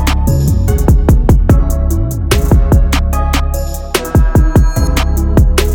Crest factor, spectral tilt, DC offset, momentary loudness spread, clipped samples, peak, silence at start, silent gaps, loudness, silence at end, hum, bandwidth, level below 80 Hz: 10 dB; -6 dB/octave; under 0.1%; 5 LU; under 0.1%; 0 dBFS; 0 s; none; -12 LUFS; 0 s; none; 19 kHz; -12 dBFS